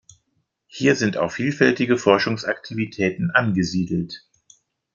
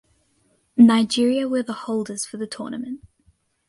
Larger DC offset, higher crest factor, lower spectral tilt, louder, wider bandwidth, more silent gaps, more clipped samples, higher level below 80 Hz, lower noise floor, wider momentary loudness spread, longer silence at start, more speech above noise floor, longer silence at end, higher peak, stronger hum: neither; about the same, 20 dB vs 18 dB; about the same, -5.5 dB/octave vs -4.5 dB/octave; about the same, -21 LUFS vs -21 LUFS; second, 7.4 kHz vs 11.5 kHz; neither; neither; about the same, -60 dBFS vs -62 dBFS; first, -72 dBFS vs -65 dBFS; second, 10 LU vs 17 LU; about the same, 0.75 s vs 0.75 s; first, 51 dB vs 45 dB; about the same, 0.75 s vs 0.7 s; about the same, -2 dBFS vs -2 dBFS; neither